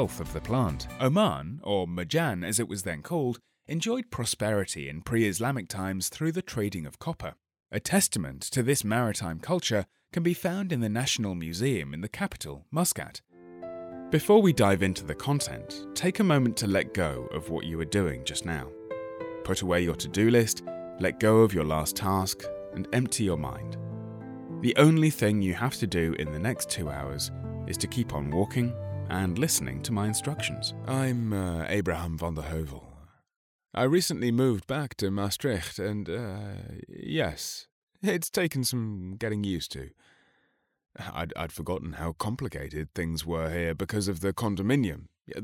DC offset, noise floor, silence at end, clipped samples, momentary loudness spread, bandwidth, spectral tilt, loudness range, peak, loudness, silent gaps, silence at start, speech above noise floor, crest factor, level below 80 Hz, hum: under 0.1%; -72 dBFS; 0 s; under 0.1%; 13 LU; 17 kHz; -5 dB/octave; 6 LU; -6 dBFS; -29 LUFS; 33.36-33.59 s, 37.72-37.87 s; 0 s; 44 dB; 22 dB; -52 dBFS; none